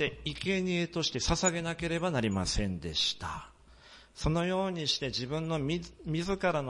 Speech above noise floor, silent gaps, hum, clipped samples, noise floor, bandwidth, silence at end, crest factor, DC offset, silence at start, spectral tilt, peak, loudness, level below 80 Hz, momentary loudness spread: 24 dB; none; none; under 0.1%; -56 dBFS; 11.5 kHz; 0 s; 18 dB; under 0.1%; 0 s; -4 dB/octave; -14 dBFS; -32 LUFS; -46 dBFS; 7 LU